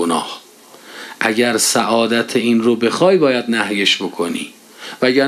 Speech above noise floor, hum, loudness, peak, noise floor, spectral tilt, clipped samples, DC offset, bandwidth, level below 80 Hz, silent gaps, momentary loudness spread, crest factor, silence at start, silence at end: 27 dB; none; -15 LUFS; 0 dBFS; -42 dBFS; -3 dB/octave; under 0.1%; under 0.1%; 14 kHz; -68 dBFS; none; 19 LU; 16 dB; 0 s; 0 s